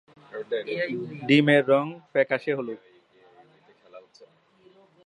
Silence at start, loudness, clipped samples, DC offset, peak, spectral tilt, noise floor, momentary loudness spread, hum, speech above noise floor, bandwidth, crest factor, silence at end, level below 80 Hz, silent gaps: 0.35 s; -24 LUFS; under 0.1%; under 0.1%; -6 dBFS; -7 dB/octave; -59 dBFS; 19 LU; none; 35 dB; 10 kHz; 20 dB; 0.8 s; -78 dBFS; none